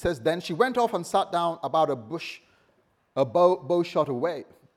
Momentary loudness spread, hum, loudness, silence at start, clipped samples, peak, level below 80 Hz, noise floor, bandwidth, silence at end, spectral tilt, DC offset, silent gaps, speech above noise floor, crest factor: 13 LU; none; -26 LUFS; 0 s; under 0.1%; -8 dBFS; -58 dBFS; -67 dBFS; 14.5 kHz; 0.35 s; -5.5 dB/octave; under 0.1%; none; 42 dB; 18 dB